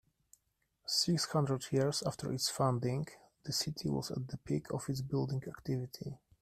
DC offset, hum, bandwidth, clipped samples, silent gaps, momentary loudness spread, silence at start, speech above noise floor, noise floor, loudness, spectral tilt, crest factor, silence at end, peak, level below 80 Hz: under 0.1%; none; 15 kHz; under 0.1%; none; 11 LU; 0.85 s; 44 dB; -80 dBFS; -36 LUFS; -5 dB/octave; 18 dB; 0.25 s; -18 dBFS; -66 dBFS